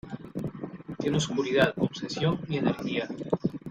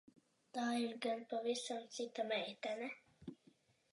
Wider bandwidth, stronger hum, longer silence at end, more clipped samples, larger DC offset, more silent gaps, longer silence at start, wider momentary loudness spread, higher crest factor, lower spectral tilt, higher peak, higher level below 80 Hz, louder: first, 13.5 kHz vs 11.5 kHz; neither; second, 0 s vs 0.6 s; neither; neither; neither; second, 0.05 s vs 0.55 s; about the same, 13 LU vs 14 LU; about the same, 20 dB vs 18 dB; first, -5.5 dB/octave vs -3 dB/octave; first, -8 dBFS vs -26 dBFS; first, -58 dBFS vs -84 dBFS; first, -29 LUFS vs -43 LUFS